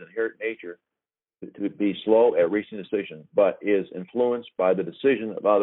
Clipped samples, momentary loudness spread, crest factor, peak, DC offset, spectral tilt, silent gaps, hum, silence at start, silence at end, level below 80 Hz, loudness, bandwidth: under 0.1%; 13 LU; 18 dB; -6 dBFS; under 0.1%; -4.5 dB/octave; none; none; 0 s; 0 s; -70 dBFS; -24 LUFS; 4.1 kHz